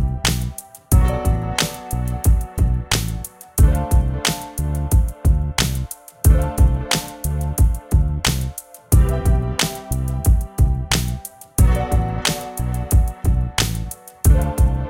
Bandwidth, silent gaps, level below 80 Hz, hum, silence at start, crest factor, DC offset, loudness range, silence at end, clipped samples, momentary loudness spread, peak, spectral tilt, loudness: 17 kHz; none; -20 dBFS; none; 0 s; 16 dB; under 0.1%; 1 LU; 0 s; under 0.1%; 9 LU; -2 dBFS; -4.5 dB/octave; -20 LUFS